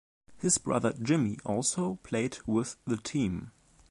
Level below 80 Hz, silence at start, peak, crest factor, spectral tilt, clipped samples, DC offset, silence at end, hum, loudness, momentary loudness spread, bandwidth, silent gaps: -58 dBFS; 0.3 s; -12 dBFS; 20 dB; -4.5 dB/octave; under 0.1%; under 0.1%; 0.4 s; none; -31 LUFS; 7 LU; 11.5 kHz; none